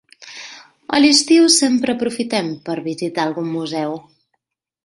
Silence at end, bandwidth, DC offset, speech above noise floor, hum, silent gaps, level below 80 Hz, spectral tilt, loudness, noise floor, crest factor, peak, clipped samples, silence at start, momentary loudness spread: 0.85 s; 11.5 kHz; under 0.1%; 56 dB; none; none; -62 dBFS; -3 dB/octave; -16 LUFS; -73 dBFS; 18 dB; 0 dBFS; under 0.1%; 0.2 s; 23 LU